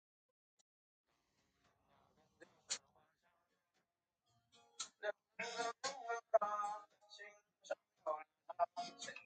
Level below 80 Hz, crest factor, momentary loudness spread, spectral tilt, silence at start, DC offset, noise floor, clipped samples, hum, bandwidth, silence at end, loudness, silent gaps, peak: under -90 dBFS; 28 dB; 19 LU; -0.5 dB/octave; 2.4 s; under 0.1%; -89 dBFS; under 0.1%; none; 9 kHz; 0 s; -44 LUFS; none; -20 dBFS